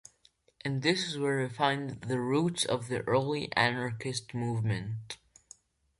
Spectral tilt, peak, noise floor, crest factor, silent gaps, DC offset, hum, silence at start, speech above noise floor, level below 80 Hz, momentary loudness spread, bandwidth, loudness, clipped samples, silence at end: -5 dB/octave; -10 dBFS; -67 dBFS; 22 dB; none; under 0.1%; none; 0.65 s; 36 dB; -64 dBFS; 8 LU; 11.5 kHz; -31 LUFS; under 0.1%; 0.85 s